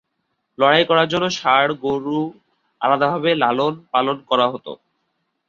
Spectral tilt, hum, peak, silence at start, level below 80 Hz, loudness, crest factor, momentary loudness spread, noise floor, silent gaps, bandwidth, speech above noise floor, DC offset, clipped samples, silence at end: -5 dB/octave; none; 0 dBFS; 0.6 s; -62 dBFS; -18 LUFS; 18 dB; 9 LU; -73 dBFS; none; 7.4 kHz; 55 dB; under 0.1%; under 0.1%; 0.75 s